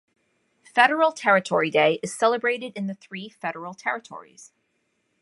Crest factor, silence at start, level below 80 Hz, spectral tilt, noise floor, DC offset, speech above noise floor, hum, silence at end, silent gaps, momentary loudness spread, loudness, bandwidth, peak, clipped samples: 22 dB; 0.75 s; -76 dBFS; -4 dB/octave; -72 dBFS; under 0.1%; 49 dB; none; 0.8 s; none; 15 LU; -23 LUFS; 11.5 kHz; -2 dBFS; under 0.1%